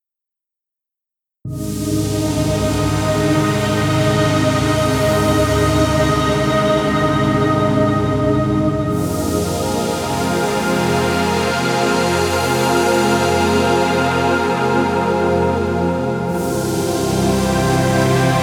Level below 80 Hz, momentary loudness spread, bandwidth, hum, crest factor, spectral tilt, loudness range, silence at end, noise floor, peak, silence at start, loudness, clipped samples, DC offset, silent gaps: -34 dBFS; 4 LU; 19.5 kHz; none; 14 dB; -5.5 dB/octave; 2 LU; 0 s; -85 dBFS; -2 dBFS; 1.45 s; -16 LUFS; under 0.1%; under 0.1%; none